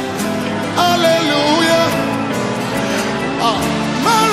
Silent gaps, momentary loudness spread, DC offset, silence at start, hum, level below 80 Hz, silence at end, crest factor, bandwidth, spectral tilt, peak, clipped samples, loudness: none; 6 LU; under 0.1%; 0 s; none; -44 dBFS; 0 s; 14 dB; 16 kHz; -4 dB/octave; -2 dBFS; under 0.1%; -15 LUFS